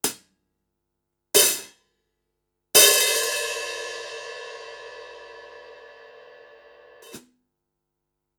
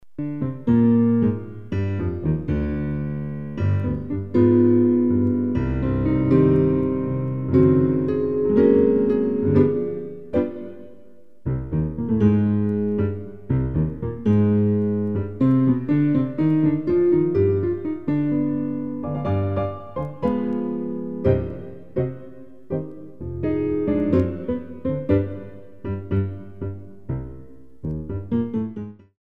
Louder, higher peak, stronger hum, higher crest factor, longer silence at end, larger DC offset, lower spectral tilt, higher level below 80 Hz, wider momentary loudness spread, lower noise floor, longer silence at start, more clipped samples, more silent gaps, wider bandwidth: first, -18 LUFS vs -22 LUFS; about the same, -2 dBFS vs -4 dBFS; neither; first, 24 dB vs 16 dB; first, 1.2 s vs 0.05 s; second, under 0.1% vs 0.9%; second, 1.5 dB/octave vs -11.5 dB/octave; second, -70 dBFS vs -40 dBFS; first, 27 LU vs 14 LU; first, -81 dBFS vs -52 dBFS; about the same, 0.05 s vs 0 s; neither; neither; first, over 20 kHz vs 4.7 kHz